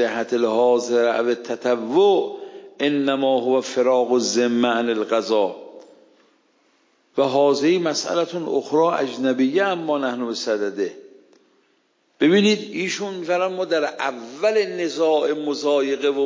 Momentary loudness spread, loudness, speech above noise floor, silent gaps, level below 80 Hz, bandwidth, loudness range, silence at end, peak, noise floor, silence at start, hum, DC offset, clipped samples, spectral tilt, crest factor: 7 LU; -21 LUFS; 44 dB; none; -78 dBFS; 7.6 kHz; 3 LU; 0 s; -6 dBFS; -64 dBFS; 0 s; none; under 0.1%; under 0.1%; -4.5 dB/octave; 16 dB